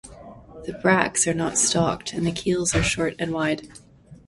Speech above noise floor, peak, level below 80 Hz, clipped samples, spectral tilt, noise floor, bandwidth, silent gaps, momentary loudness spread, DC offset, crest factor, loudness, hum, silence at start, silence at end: 20 dB; 0 dBFS; -44 dBFS; under 0.1%; -3.5 dB/octave; -43 dBFS; 11.5 kHz; none; 10 LU; under 0.1%; 24 dB; -22 LUFS; none; 0.05 s; 0.1 s